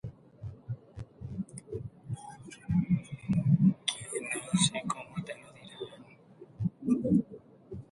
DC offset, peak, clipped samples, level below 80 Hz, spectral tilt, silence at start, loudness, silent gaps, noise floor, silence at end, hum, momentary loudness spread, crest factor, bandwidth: under 0.1%; -12 dBFS; under 0.1%; -58 dBFS; -5 dB/octave; 0.05 s; -32 LUFS; none; -55 dBFS; 0.1 s; none; 20 LU; 20 dB; 11.5 kHz